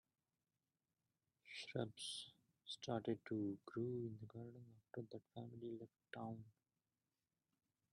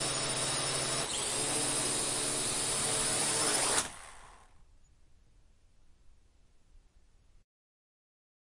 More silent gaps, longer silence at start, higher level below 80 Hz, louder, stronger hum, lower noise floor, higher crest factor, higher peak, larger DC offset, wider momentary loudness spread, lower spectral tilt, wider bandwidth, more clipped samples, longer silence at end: neither; first, 1.45 s vs 0 s; second, -86 dBFS vs -58 dBFS; second, -50 LUFS vs -30 LUFS; neither; first, under -90 dBFS vs -62 dBFS; about the same, 24 dB vs 20 dB; second, -28 dBFS vs -14 dBFS; neither; first, 12 LU vs 4 LU; first, -5.5 dB/octave vs -1 dB/octave; about the same, 11 kHz vs 11.5 kHz; neither; second, 1.4 s vs 1.6 s